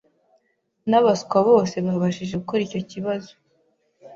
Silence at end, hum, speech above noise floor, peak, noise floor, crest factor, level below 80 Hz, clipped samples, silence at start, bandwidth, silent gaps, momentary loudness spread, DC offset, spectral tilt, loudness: 0 s; none; 49 dB; -4 dBFS; -69 dBFS; 18 dB; -60 dBFS; under 0.1%; 0.85 s; 7.6 kHz; none; 11 LU; under 0.1%; -6.5 dB/octave; -22 LUFS